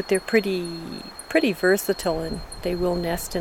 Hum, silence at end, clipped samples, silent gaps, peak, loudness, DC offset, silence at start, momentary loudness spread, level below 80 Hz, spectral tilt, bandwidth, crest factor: none; 0 s; under 0.1%; none; -6 dBFS; -24 LUFS; under 0.1%; 0 s; 12 LU; -42 dBFS; -4.5 dB/octave; 18 kHz; 18 dB